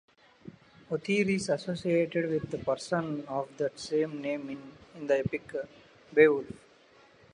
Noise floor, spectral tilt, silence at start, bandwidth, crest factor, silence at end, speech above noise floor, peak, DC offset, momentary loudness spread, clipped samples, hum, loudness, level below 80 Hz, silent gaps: -59 dBFS; -6 dB/octave; 0.9 s; 10.5 kHz; 22 dB; 0.8 s; 30 dB; -8 dBFS; under 0.1%; 18 LU; under 0.1%; none; -30 LUFS; -64 dBFS; none